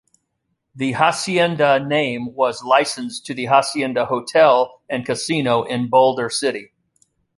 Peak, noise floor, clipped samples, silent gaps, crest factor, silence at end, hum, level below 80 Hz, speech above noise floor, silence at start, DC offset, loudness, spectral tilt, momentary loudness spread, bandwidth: -2 dBFS; -73 dBFS; under 0.1%; none; 18 dB; 0.75 s; none; -62 dBFS; 55 dB; 0.75 s; under 0.1%; -18 LUFS; -4 dB/octave; 9 LU; 11.5 kHz